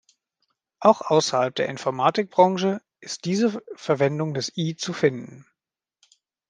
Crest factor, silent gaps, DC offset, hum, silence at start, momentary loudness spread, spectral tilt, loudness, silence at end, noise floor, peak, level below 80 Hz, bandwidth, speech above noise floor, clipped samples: 22 dB; none; under 0.1%; none; 0.8 s; 13 LU; -5 dB/octave; -23 LUFS; 1.1 s; -88 dBFS; -2 dBFS; -72 dBFS; 10 kHz; 65 dB; under 0.1%